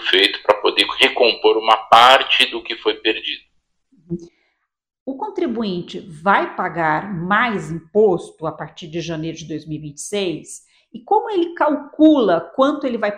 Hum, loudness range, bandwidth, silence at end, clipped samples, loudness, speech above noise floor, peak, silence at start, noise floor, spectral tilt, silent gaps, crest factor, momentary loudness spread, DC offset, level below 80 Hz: none; 11 LU; 16 kHz; 0 s; under 0.1%; -17 LUFS; 51 dB; 0 dBFS; 0 s; -69 dBFS; -4 dB/octave; 5.00-5.06 s; 18 dB; 18 LU; under 0.1%; -58 dBFS